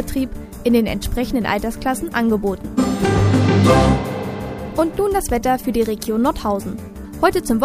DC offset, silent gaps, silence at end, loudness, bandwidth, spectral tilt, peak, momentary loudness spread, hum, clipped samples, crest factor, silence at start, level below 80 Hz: under 0.1%; none; 0 s; -19 LUFS; 15.5 kHz; -6 dB/octave; 0 dBFS; 11 LU; none; under 0.1%; 18 dB; 0 s; -32 dBFS